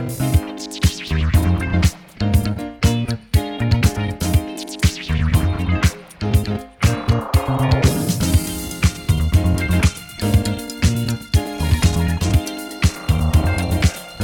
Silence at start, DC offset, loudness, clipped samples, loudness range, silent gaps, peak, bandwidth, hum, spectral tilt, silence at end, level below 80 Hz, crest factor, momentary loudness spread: 0 s; under 0.1%; -19 LUFS; under 0.1%; 1 LU; none; -2 dBFS; 19 kHz; none; -5.5 dB/octave; 0 s; -26 dBFS; 16 dB; 4 LU